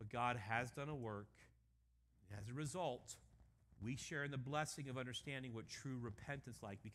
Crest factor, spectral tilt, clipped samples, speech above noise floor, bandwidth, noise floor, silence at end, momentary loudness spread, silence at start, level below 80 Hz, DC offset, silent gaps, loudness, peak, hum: 22 dB; -4.5 dB/octave; under 0.1%; 29 dB; 15 kHz; -77 dBFS; 0 s; 11 LU; 0 s; -72 dBFS; under 0.1%; none; -47 LUFS; -26 dBFS; none